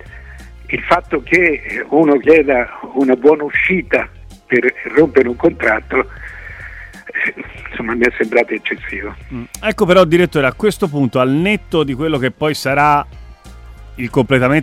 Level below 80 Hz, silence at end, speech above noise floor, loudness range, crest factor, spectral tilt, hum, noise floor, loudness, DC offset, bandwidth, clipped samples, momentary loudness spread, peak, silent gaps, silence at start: -38 dBFS; 0 s; 22 dB; 5 LU; 16 dB; -6 dB/octave; none; -36 dBFS; -14 LUFS; under 0.1%; 15.5 kHz; under 0.1%; 17 LU; 0 dBFS; none; 0.05 s